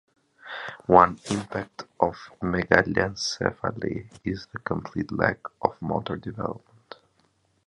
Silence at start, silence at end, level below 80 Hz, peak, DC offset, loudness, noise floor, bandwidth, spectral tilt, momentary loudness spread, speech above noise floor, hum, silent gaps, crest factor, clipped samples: 0.45 s; 1.1 s; -50 dBFS; 0 dBFS; under 0.1%; -26 LUFS; -67 dBFS; 11.5 kHz; -5 dB/octave; 14 LU; 41 dB; none; none; 26 dB; under 0.1%